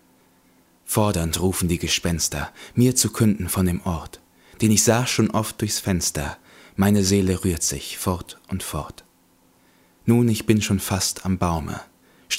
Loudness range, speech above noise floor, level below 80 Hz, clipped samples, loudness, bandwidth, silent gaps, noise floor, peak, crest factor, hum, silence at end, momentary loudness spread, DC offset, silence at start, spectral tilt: 4 LU; 37 dB; -42 dBFS; under 0.1%; -22 LUFS; 16 kHz; none; -59 dBFS; -2 dBFS; 20 dB; none; 0 s; 13 LU; under 0.1%; 0.85 s; -4.5 dB/octave